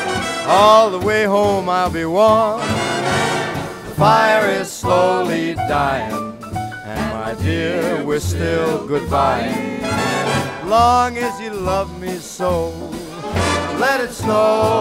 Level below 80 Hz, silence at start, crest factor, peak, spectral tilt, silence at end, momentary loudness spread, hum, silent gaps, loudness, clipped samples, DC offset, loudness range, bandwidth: -40 dBFS; 0 s; 16 dB; 0 dBFS; -5 dB/octave; 0 s; 12 LU; none; none; -17 LUFS; under 0.1%; under 0.1%; 5 LU; 16 kHz